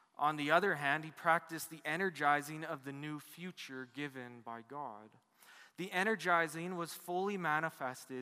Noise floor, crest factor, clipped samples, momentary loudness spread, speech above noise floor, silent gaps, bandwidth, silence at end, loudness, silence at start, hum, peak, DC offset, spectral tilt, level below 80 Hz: -62 dBFS; 22 dB; under 0.1%; 16 LU; 24 dB; none; 15.5 kHz; 0 s; -37 LUFS; 0.2 s; none; -14 dBFS; under 0.1%; -4.5 dB/octave; -90 dBFS